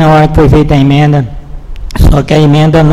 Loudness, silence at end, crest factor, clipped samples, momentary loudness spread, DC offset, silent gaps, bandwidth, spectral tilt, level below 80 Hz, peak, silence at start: -7 LUFS; 0 s; 6 dB; 4%; 12 LU; under 0.1%; none; 13 kHz; -7.5 dB/octave; -14 dBFS; 0 dBFS; 0 s